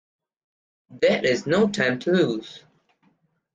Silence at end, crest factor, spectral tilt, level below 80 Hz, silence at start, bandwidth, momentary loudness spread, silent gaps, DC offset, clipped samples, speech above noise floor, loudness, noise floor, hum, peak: 0.95 s; 18 dB; -5.5 dB/octave; -64 dBFS; 0.9 s; 9.4 kHz; 7 LU; none; under 0.1%; under 0.1%; 44 dB; -22 LUFS; -66 dBFS; none; -8 dBFS